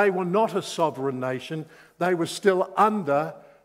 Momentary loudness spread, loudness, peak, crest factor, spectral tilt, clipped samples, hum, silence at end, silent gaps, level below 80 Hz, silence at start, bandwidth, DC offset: 12 LU; -25 LUFS; -6 dBFS; 18 dB; -5.5 dB/octave; under 0.1%; none; 0.25 s; none; -76 dBFS; 0 s; 16 kHz; under 0.1%